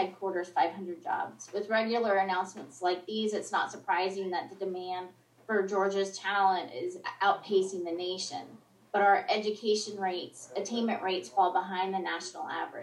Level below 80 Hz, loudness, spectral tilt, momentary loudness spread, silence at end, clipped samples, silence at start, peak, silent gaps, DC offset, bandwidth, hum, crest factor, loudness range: under -90 dBFS; -31 LUFS; -3.5 dB/octave; 10 LU; 0 s; under 0.1%; 0 s; -14 dBFS; none; under 0.1%; 12 kHz; none; 18 dB; 3 LU